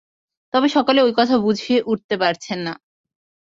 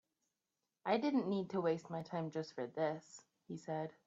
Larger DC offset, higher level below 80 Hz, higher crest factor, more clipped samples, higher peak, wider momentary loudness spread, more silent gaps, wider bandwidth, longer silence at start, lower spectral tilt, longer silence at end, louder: neither; first, -62 dBFS vs -84 dBFS; about the same, 16 dB vs 20 dB; neither; first, -2 dBFS vs -22 dBFS; second, 11 LU vs 14 LU; first, 2.04-2.09 s vs none; about the same, 7.8 kHz vs 8 kHz; second, 0.55 s vs 0.85 s; about the same, -5 dB/octave vs -6 dB/octave; first, 0.7 s vs 0.15 s; first, -18 LUFS vs -40 LUFS